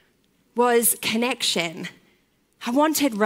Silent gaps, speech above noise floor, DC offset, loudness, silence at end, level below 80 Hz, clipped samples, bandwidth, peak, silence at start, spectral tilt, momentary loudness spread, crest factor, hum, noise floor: none; 43 dB; under 0.1%; -21 LUFS; 0 s; -72 dBFS; under 0.1%; 16.5 kHz; -4 dBFS; 0.55 s; -2.5 dB/octave; 15 LU; 18 dB; none; -64 dBFS